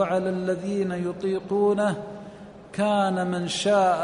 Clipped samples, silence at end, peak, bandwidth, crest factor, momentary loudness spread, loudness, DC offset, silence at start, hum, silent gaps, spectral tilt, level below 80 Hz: under 0.1%; 0 s; -10 dBFS; 10.5 kHz; 14 dB; 16 LU; -25 LUFS; under 0.1%; 0 s; none; none; -5.5 dB/octave; -60 dBFS